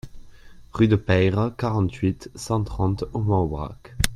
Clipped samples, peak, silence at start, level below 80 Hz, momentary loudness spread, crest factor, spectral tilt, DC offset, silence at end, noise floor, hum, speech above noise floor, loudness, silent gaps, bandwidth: under 0.1%; -2 dBFS; 0.05 s; -38 dBFS; 12 LU; 22 dB; -6.5 dB/octave; under 0.1%; 0 s; -44 dBFS; none; 22 dB; -23 LUFS; none; 14.5 kHz